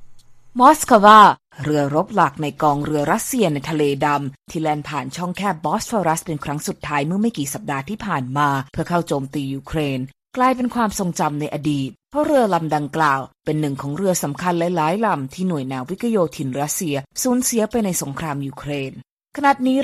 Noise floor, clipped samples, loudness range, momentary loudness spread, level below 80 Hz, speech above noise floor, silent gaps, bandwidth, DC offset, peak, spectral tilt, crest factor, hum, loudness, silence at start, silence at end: -40 dBFS; under 0.1%; 7 LU; 10 LU; -50 dBFS; 21 dB; 19.11-19.17 s; 15.5 kHz; under 0.1%; 0 dBFS; -5 dB/octave; 20 dB; none; -19 LUFS; 0 s; 0 s